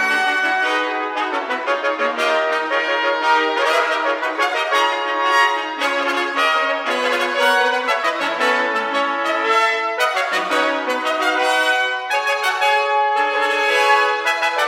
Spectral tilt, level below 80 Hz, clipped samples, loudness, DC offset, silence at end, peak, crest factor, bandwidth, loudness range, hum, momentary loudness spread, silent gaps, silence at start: -0.5 dB/octave; -78 dBFS; under 0.1%; -17 LUFS; under 0.1%; 0 s; -2 dBFS; 16 dB; 18 kHz; 1 LU; none; 4 LU; none; 0 s